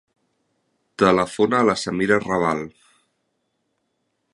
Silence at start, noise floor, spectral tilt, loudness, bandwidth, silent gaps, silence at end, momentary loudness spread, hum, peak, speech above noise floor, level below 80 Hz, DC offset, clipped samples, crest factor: 1 s; -73 dBFS; -5.5 dB/octave; -20 LUFS; 11.5 kHz; none; 1.65 s; 11 LU; none; -2 dBFS; 54 dB; -56 dBFS; under 0.1%; under 0.1%; 22 dB